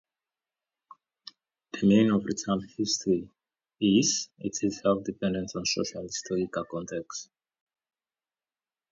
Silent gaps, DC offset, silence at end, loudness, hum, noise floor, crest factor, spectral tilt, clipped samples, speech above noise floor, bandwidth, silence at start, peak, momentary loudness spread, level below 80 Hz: none; under 0.1%; 1.7 s; -28 LUFS; none; under -90 dBFS; 20 dB; -4.5 dB/octave; under 0.1%; over 63 dB; 7.8 kHz; 1.75 s; -10 dBFS; 17 LU; -62 dBFS